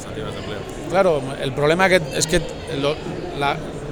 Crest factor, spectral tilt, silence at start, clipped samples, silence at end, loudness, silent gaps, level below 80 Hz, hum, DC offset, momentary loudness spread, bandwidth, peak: 20 dB; -4 dB/octave; 0 s; under 0.1%; 0 s; -21 LUFS; none; -38 dBFS; none; under 0.1%; 13 LU; over 20 kHz; 0 dBFS